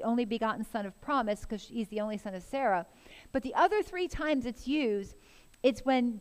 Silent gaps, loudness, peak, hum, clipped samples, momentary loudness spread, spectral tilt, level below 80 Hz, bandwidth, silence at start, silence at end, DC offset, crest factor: none; -32 LUFS; -14 dBFS; none; under 0.1%; 10 LU; -5.5 dB/octave; -54 dBFS; 15.5 kHz; 0 s; 0 s; under 0.1%; 18 dB